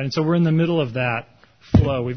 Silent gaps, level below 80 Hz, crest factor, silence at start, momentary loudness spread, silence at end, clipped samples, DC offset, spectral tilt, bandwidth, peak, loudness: none; -34 dBFS; 16 dB; 0 s; 6 LU; 0 s; under 0.1%; 0.2%; -8 dB/octave; 6.4 kHz; -4 dBFS; -20 LUFS